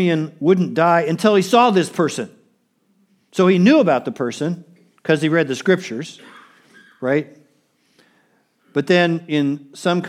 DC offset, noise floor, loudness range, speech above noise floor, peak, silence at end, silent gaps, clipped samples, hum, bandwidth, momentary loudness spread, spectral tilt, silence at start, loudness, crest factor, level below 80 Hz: under 0.1%; -63 dBFS; 7 LU; 46 dB; 0 dBFS; 0 s; none; under 0.1%; none; 14.5 kHz; 15 LU; -6 dB/octave; 0 s; -18 LUFS; 18 dB; -74 dBFS